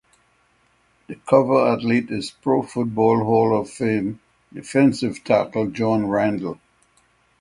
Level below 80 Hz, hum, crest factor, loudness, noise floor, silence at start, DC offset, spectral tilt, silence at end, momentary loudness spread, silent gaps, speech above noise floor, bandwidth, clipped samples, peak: -58 dBFS; none; 20 dB; -20 LUFS; -62 dBFS; 1.1 s; under 0.1%; -7 dB/octave; 0.85 s; 16 LU; none; 42 dB; 11.5 kHz; under 0.1%; 0 dBFS